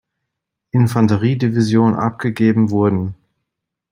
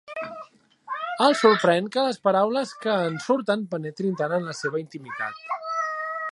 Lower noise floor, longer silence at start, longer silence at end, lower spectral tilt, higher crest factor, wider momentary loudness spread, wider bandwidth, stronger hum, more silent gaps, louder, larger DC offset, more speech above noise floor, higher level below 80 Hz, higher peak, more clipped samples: first, -79 dBFS vs -47 dBFS; first, 0.75 s vs 0.1 s; first, 0.8 s vs 0 s; first, -8 dB/octave vs -5 dB/octave; second, 14 dB vs 22 dB; second, 6 LU vs 15 LU; first, 15.5 kHz vs 11.5 kHz; neither; neither; first, -16 LUFS vs -24 LUFS; neither; first, 64 dB vs 23 dB; first, -56 dBFS vs -76 dBFS; about the same, -2 dBFS vs -2 dBFS; neither